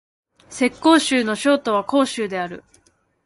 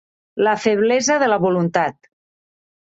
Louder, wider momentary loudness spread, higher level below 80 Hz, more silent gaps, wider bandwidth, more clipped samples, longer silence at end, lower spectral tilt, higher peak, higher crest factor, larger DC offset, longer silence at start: about the same, -19 LUFS vs -18 LUFS; first, 14 LU vs 6 LU; about the same, -60 dBFS vs -62 dBFS; neither; first, 11.5 kHz vs 8 kHz; neither; second, 0.65 s vs 1 s; about the same, -3.5 dB/octave vs -4.5 dB/octave; about the same, -2 dBFS vs -2 dBFS; about the same, 18 dB vs 18 dB; neither; first, 0.5 s vs 0.35 s